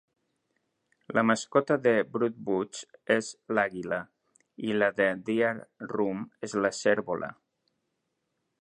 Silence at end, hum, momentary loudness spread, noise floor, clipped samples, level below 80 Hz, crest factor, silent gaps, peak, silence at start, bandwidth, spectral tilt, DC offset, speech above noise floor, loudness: 1.3 s; none; 12 LU; -80 dBFS; under 0.1%; -72 dBFS; 22 dB; none; -8 dBFS; 1.1 s; 11 kHz; -5 dB/octave; under 0.1%; 52 dB; -29 LUFS